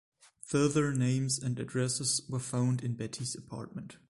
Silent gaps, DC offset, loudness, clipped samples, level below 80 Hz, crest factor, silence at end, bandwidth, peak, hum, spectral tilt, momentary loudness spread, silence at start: none; under 0.1%; -32 LUFS; under 0.1%; -64 dBFS; 16 dB; 0.15 s; 11.5 kHz; -16 dBFS; none; -5 dB/octave; 13 LU; 0.45 s